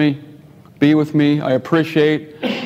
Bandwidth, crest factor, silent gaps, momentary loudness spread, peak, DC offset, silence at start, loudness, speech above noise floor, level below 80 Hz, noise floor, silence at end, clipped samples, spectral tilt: 8 kHz; 16 dB; none; 7 LU; 0 dBFS; under 0.1%; 0 s; -16 LUFS; 27 dB; -62 dBFS; -42 dBFS; 0 s; under 0.1%; -7.5 dB/octave